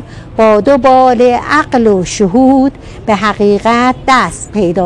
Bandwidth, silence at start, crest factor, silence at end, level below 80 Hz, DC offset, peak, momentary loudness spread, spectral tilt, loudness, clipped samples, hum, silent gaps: 11.5 kHz; 0 s; 10 dB; 0 s; -34 dBFS; under 0.1%; 0 dBFS; 8 LU; -5.5 dB/octave; -9 LUFS; under 0.1%; none; none